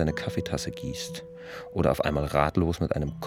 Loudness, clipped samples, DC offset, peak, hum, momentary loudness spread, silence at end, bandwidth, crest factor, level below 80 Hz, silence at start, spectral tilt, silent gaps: -28 LUFS; under 0.1%; under 0.1%; -6 dBFS; none; 13 LU; 0 s; 17 kHz; 22 dB; -42 dBFS; 0 s; -6 dB/octave; none